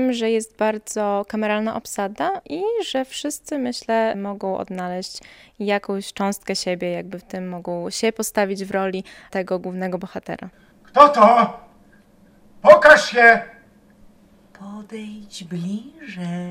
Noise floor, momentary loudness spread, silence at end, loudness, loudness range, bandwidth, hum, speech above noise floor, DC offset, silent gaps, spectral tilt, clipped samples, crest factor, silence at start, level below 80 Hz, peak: -52 dBFS; 20 LU; 0 s; -19 LUFS; 11 LU; 16 kHz; none; 32 dB; under 0.1%; none; -4 dB/octave; under 0.1%; 20 dB; 0 s; -58 dBFS; 0 dBFS